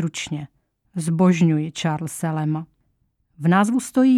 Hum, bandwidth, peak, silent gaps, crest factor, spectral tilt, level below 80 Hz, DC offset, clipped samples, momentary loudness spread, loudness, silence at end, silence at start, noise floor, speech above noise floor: none; 14 kHz; -6 dBFS; none; 14 dB; -6.5 dB/octave; -62 dBFS; under 0.1%; under 0.1%; 13 LU; -21 LUFS; 0 s; 0 s; -68 dBFS; 48 dB